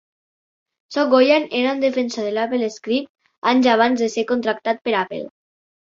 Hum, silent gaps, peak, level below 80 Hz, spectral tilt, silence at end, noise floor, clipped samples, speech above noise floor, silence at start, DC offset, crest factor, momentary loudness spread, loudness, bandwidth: none; 3.09-3.15 s, 3.38-3.42 s; -2 dBFS; -66 dBFS; -4 dB/octave; 0.65 s; under -90 dBFS; under 0.1%; over 72 dB; 0.9 s; under 0.1%; 18 dB; 10 LU; -19 LUFS; 7.6 kHz